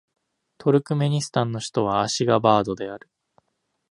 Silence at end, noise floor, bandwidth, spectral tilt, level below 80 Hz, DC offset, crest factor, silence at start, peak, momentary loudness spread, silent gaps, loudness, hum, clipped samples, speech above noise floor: 0.95 s; -75 dBFS; 11.5 kHz; -5.5 dB/octave; -60 dBFS; under 0.1%; 20 dB; 0.6 s; -2 dBFS; 11 LU; none; -22 LUFS; none; under 0.1%; 53 dB